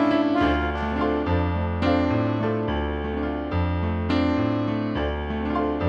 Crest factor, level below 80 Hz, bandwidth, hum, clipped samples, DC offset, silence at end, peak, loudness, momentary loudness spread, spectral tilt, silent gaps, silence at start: 14 dB; -34 dBFS; 6.8 kHz; none; under 0.1%; under 0.1%; 0 s; -8 dBFS; -24 LUFS; 6 LU; -8.5 dB/octave; none; 0 s